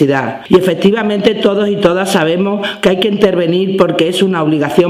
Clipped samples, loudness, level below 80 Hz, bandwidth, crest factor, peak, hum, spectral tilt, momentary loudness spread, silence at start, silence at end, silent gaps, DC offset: 0.6%; -12 LUFS; -46 dBFS; 15.5 kHz; 12 dB; 0 dBFS; none; -6 dB/octave; 2 LU; 0 s; 0 s; none; under 0.1%